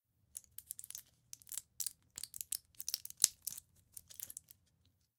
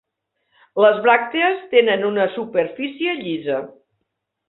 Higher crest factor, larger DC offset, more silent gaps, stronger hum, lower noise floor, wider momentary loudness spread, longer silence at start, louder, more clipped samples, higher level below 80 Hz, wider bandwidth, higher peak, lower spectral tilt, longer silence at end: first, 46 dB vs 18 dB; neither; neither; neither; about the same, -76 dBFS vs -76 dBFS; first, 20 LU vs 10 LU; second, 0.35 s vs 0.75 s; second, -40 LUFS vs -19 LUFS; neither; second, -80 dBFS vs -68 dBFS; first, 18 kHz vs 4.1 kHz; about the same, 0 dBFS vs -2 dBFS; second, 2 dB/octave vs -9 dB/octave; about the same, 0.8 s vs 0.8 s